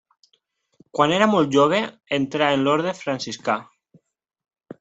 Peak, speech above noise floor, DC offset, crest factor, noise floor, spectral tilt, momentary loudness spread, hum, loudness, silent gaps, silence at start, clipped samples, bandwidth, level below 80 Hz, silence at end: -2 dBFS; 48 dB; under 0.1%; 20 dB; -68 dBFS; -5 dB/octave; 10 LU; none; -21 LUFS; none; 0.95 s; under 0.1%; 8.2 kHz; -64 dBFS; 1.2 s